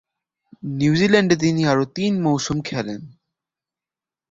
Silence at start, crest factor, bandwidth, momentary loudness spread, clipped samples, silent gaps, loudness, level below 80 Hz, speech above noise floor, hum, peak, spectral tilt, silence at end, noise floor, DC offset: 0.65 s; 20 dB; 7.8 kHz; 15 LU; under 0.1%; none; -19 LUFS; -52 dBFS; 71 dB; none; -2 dBFS; -5.5 dB/octave; 1.25 s; -90 dBFS; under 0.1%